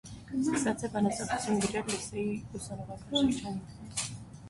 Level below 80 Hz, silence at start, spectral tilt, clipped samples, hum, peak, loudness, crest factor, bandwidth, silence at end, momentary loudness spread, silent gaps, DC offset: -56 dBFS; 0.05 s; -4 dB/octave; under 0.1%; none; -16 dBFS; -33 LUFS; 18 dB; 11.5 kHz; 0 s; 11 LU; none; under 0.1%